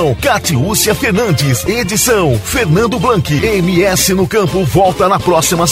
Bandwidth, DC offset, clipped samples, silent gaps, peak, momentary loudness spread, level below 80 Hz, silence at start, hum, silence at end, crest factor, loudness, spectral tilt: 16.5 kHz; under 0.1%; under 0.1%; none; 0 dBFS; 3 LU; -32 dBFS; 0 s; none; 0 s; 12 dB; -12 LUFS; -4.5 dB/octave